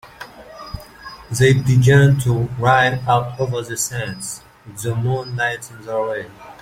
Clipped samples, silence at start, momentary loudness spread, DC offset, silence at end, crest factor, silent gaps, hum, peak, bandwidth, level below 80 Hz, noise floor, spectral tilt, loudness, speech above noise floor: under 0.1%; 0.05 s; 23 LU; under 0.1%; 0.05 s; 16 dB; none; none; -2 dBFS; 15.5 kHz; -44 dBFS; -38 dBFS; -5.5 dB/octave; -18 LUFS; 21 dB